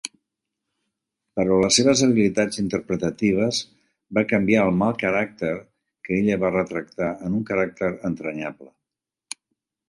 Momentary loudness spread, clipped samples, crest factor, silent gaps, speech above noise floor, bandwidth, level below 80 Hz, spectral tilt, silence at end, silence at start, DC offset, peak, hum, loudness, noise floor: 16 LU; under 0.1%; 18 dB; none; 65 dB; 11.5 kHz; -54 dBFS; -4.5 dB/octave; 1.25 s; 0.05 s; under 0.1%; -4 dBFS; none; -22 LUFS; -87 dBFS